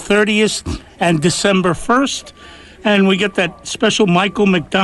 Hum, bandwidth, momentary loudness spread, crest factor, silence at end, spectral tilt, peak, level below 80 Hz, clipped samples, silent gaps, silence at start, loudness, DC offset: none; 12 kHz; 7 LU; 12 dB; 0 s; -4.5 dB/octave; -4 dBFS; -40 dBFS; under 0.1%; none; 0 s; -15 LUFS; under 0.1%